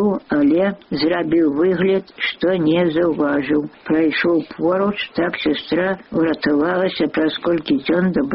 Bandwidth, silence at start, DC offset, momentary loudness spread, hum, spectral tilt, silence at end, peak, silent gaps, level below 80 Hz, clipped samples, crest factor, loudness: 5.8 kHz; 0 s; under 0.1%; 5 LU; none; -4.5 dB/octave; 0 s; -6 dBFS; none; -52 dBFS; under 0.1%; 10 dB; -18 LUFS